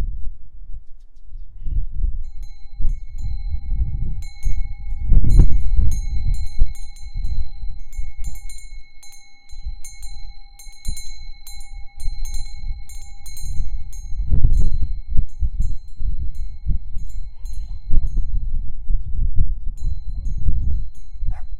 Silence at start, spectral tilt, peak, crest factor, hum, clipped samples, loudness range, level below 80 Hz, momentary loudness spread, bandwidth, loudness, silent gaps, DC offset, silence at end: 0 s; -6 dB/octave; 0 dBFS; 14 dB; none; under 0.1%; 14 LU; -20 dBFS; 19 LU; 9.8 kHz; -28 LUFS; none; under 0.1%; 0 s